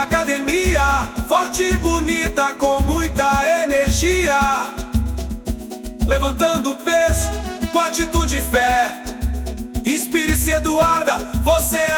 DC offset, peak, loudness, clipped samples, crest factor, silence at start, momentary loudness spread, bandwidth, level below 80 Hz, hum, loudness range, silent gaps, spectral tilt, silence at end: under 0.1%; -2 dBFS; -18 LUFS; under 0.1%; 16 dB; 0 s; 9 LU; 19.5 kHz; -26 dBFS; none; 2 LU; none; -4 dB/octave; 0 s